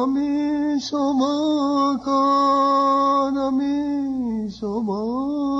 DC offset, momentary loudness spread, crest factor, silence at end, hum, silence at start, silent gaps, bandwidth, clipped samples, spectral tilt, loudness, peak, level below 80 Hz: under 0.1%; 7 LU; 10 dB; 0 s; none; 0 s; none; 7.8 kHz; under 0.1%; -5.5 dB/octave; -21 LUFS; -10 dBFS; -54 dBFS